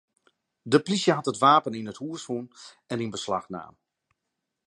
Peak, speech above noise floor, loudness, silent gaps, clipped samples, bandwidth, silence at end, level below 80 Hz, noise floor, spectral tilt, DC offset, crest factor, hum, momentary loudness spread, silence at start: -6 dBFS; 57 dB; -25 LUFS; none; under 0.1%; 11.5 kHz; 0.95 s; -70 dBFS; -83 dBFS; -5 dB/octave; under 0.1%; 22 dB; none; 20 LU; 0.65 s